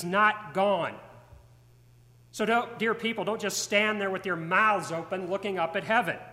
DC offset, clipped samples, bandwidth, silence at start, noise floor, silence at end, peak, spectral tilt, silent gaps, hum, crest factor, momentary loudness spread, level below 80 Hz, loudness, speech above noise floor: under 0.1%; under 0.1%; 16 kHz; 0 s; -57 dBFS; 0 s; -10 dBFS; -3.5 dB/octave; none; none; 18 dB; 9 LU; -66 dBFS; -27 LUFS; 29 dB